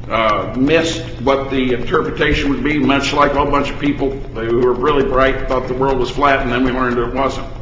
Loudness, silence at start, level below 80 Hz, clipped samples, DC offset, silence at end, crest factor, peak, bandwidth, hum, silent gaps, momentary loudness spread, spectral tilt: -16 LUFS; 0 s; -28 dBFS; under 0.1%; under 0.1%; 0 s; 16 dB; 0 dBFS; 7.8 kHz; none; none; 6 LU; -5.5 dB/octave